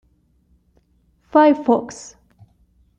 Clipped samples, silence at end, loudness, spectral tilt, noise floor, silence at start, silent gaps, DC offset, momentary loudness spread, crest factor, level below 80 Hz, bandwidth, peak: under 0.1%; 1.05 s; -16 LUFS; -5 dB/octave; -60 dBFS; 1.35 s; none; under 0.1%; 23 LU; 18 dB; -60 dBFS; 9 kHz; -4 dBFS